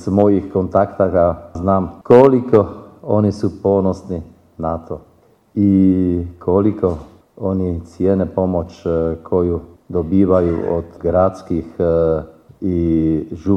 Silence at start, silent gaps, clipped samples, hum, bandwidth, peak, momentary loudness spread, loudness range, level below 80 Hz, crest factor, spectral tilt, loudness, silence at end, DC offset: 0 s; none; under 0.1%; none; 8.4 kHz; 0 dBFS; 12 LU; 4 LU; -40 dBFS; 16 dB; -10 dB/octave; -17 LUFS; 0 s; under 0.1%